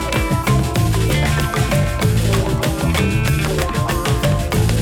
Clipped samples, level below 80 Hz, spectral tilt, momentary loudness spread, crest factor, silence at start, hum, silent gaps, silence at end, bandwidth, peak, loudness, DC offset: under 0.1%; -24 dBFS; -5.5 dB/octave; 2 LU; 10 dB; 0 s; none; none; 0 s; 17.5 kHz; -6 dBFS; -17 LUFS; under 0.1%